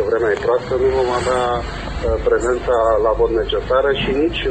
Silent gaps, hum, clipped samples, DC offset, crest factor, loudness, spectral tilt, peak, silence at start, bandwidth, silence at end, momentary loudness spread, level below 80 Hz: none; none; under 0.1%; 0.2%; 12 dB; -18 LUFS; -5.5 dB/octave; -4 dBFS; 0 s; 8.8 kHz; 0 s; 5 LU; -30 dBFS